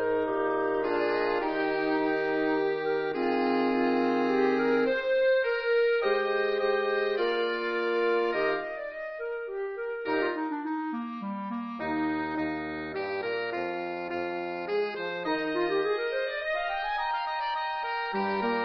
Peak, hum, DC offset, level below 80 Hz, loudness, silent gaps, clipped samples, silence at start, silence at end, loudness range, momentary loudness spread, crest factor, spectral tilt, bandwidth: -14 dBFS; none; under 0.1%; -62 dBFS; -29 LUFS; none; under 0.1%; 0 s; 0 s; 6 LU; 9 LU; 14 dB; -6.5 dB/octave; 6.2 kHz